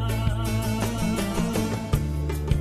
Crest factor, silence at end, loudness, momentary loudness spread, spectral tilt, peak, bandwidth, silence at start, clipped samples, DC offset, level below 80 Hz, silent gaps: 16 dB; 0 s; -26 LUFS; 1 LU; -6 dB/octave; -8 dBFS; 15 kHz; 0 s; under 0.1%; under 0.1%; -32 dBFS; none